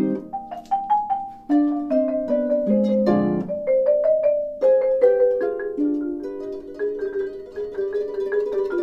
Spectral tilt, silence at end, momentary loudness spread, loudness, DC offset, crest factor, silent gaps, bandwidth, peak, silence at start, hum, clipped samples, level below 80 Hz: -9.5 dB/octave; 0 s; 12 LU; -22 LUFS; under 0.1%; 14 dB; none; 5.8 kHz; -6 dBFS; 0 s; none; under 0.1%; -56 dBFS